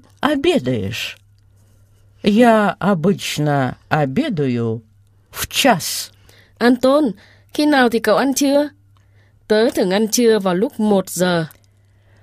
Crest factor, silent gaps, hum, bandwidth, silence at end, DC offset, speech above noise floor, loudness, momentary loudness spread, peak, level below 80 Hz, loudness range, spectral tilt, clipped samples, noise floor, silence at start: 18 dB; none; none; 15.5 kHz; 0.75 s; under 0.1%; 37 dB; -17 LUFS; 11 LU; 0 dBFS; -52 dBFS; 2 LU; -4.5 dB/octave; under 0.1%; -53 dBFS; 0.2 s